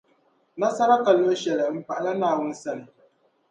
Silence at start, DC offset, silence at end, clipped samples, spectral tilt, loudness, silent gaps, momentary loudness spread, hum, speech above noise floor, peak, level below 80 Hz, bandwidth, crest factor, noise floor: 0.55 s; under 0.1%; 0.65 s; under 0.1%; -5 dB/octave; -23 LUFS; none; 15 LU; none; 42 dB; -6 dBFS; -76 dBFS; 9.4 kHz; 18 dB; -64 dBFS